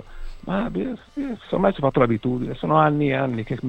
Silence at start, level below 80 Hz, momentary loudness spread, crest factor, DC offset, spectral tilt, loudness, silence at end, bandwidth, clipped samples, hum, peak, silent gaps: 0 s; -40 dBFS; 12 LU; 20 dB; under 0.1%; -9 dB/octave; -22 LUFS; 0 s; 8.2 kHz; under 0.1%; none; -2 dBFS; none